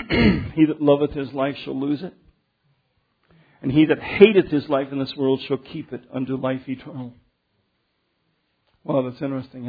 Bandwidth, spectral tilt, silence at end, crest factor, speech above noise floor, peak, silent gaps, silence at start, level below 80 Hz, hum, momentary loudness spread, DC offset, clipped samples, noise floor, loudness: 5 kHz; -9.5 dB/octave; 0 s; 22 dB; 50 dB; 0 dBFS; none; 0 s; -44 dBFS; none; 18 LU; under 0.1%; under 0.1%; -71 dBFS; -21 LUFS